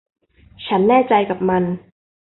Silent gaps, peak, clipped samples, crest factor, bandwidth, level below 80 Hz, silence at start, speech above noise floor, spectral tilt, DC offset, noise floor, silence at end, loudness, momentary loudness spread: none; -2 dBFS; under 0.1%; 16 dB; 4.2 kHz; -54 dBFS; 0.6 s; 22 dB; -11.5 dB/octave; under 0.1%; -38 dBFS; 0.5 s; -17 LUFS; 14 LU